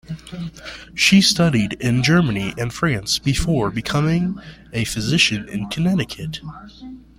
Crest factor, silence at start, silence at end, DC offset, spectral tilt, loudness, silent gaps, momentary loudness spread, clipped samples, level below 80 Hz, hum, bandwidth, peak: 18 dB; 0.1 s; 0.2 s; under 0.1%; -4.5 dB/octave; -18 LUFS; none; 18 LU; under 0.1%; -40 dBFS; none; 16 kHz; -2 dBFS